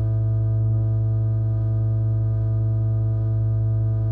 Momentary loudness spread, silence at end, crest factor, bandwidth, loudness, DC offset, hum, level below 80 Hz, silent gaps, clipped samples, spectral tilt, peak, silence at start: 1 LU; 0 s; 6 dB; 1.6 kHz; -22 LUFS; under 0.1%; none; -32 dBFS; none; under 0.1%; -13 dB/octave; -14 dBFS; 0 s